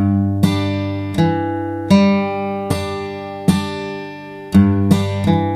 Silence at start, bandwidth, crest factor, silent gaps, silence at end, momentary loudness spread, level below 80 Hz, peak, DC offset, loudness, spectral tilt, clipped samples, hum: 0 s; 14.5 kHz; 16 dB; none; 0 s; 12 LU; -42 dBFS; 0 dBFS; under 0.1%; -17 LUFS; -7 dB/octave; under 0.1%; 50 Hz at -30 dBFS